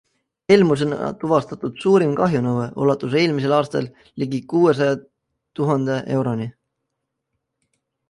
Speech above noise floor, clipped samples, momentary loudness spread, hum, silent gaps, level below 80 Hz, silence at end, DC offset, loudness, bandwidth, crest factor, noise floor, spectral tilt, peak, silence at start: 59 dB; under 0.1%; 12 LU; none; none; -60 dBFS; 1.6 s; under 0.1%; -20 LUFS; 11.5 kHz; 18 dB; -78 dBFS; -7 dB/octave; -2 dBFS; 0.5 s